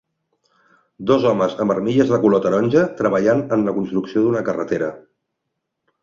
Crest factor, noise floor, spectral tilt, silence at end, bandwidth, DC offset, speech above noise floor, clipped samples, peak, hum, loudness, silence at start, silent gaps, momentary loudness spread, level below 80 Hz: 18 dB; -77 dBFS; -7.5 dB/octave; 1.05 s; 7.4 kHz; under 0.1%; 60 dB; under 0.1%; -2 dBFS; none; -18 LUFS; 1 s; none; 7 LU; -58 dBFS